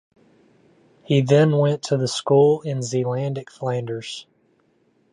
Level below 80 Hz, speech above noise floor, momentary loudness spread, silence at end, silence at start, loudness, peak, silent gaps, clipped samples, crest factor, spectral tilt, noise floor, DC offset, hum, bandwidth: -66 dBFS; 43 dB; 13 LU; 0.9 s; 1.1 s; -21 LUFS; -4 dBFS; none; under 0.1%; 18 dB; -6.5 dB/octave; -63 dBFS; under 0.1%; none; 11 kHz